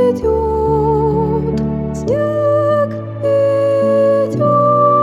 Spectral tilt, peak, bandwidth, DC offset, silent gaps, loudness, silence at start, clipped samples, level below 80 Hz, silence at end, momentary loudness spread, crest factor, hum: -8.5 dB/octave; -2 dBFS; 10.5 kHz; under 0.1%; none; -14 LUFS; 0 s; under 0.1%; -32 dBFS; 0 s; 6 LU; 12 dB; none